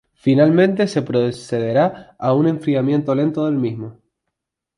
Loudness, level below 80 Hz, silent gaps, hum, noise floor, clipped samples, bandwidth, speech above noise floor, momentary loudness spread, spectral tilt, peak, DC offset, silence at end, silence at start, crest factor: -18 LUFS; -60 dBFS; none; none; -79 dBFS; under 0.1%; 11 kHz; 62 dB; 10 LU; -8 dB/octave; -2 dBFS; under 0.1%; 0.85 s; 0.25 s; 16 dB